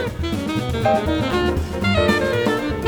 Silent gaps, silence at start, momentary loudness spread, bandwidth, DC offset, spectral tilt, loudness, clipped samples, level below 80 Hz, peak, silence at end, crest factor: none; 0 s; 6 LU; over 20 kHz; under 0.1%; -6 dB/octave; -20 LUFS; under 0.1%; -32 dBFS; -4 dBFS; 0 s; 14 dB